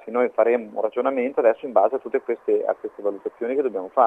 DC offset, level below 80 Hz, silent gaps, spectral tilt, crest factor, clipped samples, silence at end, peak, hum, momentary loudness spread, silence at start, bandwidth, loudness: under 0.1%; -74 dBFS; none; -7.5 dB/octave; 18 dB; under 0.1%; 0 s; -4 dBFS; none; 7 LU; 0.05 s; 3.7 kHz; -23 LUFS